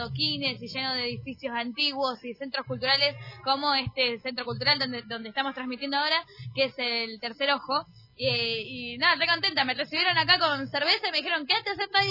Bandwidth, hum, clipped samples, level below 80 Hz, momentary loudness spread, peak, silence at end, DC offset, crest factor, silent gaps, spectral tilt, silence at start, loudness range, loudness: 5.8 kHz; none; under 0.1%; -64 dBFS; 10 LU; -6 dBFS; 0 s; under 0.1%; 22 dB; none; -4.5 dB/octave; 0 s; 4 LU; -26 LUFS